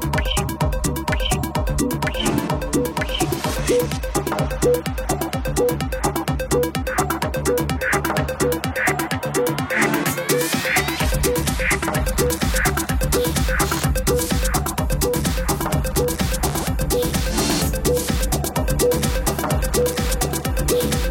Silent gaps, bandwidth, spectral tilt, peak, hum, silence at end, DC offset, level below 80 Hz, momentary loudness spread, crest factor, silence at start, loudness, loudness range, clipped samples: none; 17 kHz; -4 dB/octave; -4 dBFS; none; 0 s; under 0.1%; -28 dBFS; 3 LU; 16 dB; 0 s; -21 LUFS; 2 LU; under 0.1%